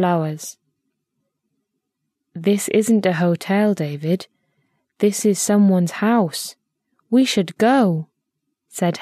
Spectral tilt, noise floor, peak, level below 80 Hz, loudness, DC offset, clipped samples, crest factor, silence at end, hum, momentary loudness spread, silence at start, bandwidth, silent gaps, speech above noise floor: -5.5 dB/octave; -77 dBFS; -4 dBFS; -70 dBFS; -19 LUFS; under 0.1%; under 0.1%; 16 dB; 0 s; none; 13 LU; 0 s; 14 kHz; none; 60 dB